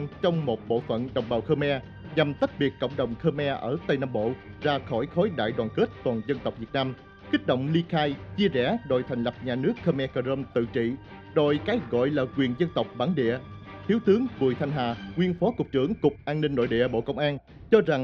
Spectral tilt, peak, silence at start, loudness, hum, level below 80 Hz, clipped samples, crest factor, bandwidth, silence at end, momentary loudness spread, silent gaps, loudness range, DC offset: -8.5 dB/octave; -6 dBFS; 0 s; -27 LUFS; none; -54 dBFS; under 0.1%; 20 dB; 6.8 kHz; 0 s; 6 LU; none; 2 LU; under 0.1%